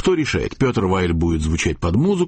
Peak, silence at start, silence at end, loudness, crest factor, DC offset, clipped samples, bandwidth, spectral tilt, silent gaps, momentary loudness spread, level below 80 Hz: -6 dBFS; 0 s; 0 s; -19 LUFS; 12 dB; under 0.1%; under 0.1%; 8.8 kHz; -6 dB/octave; none; 2 LU; -32 dBFS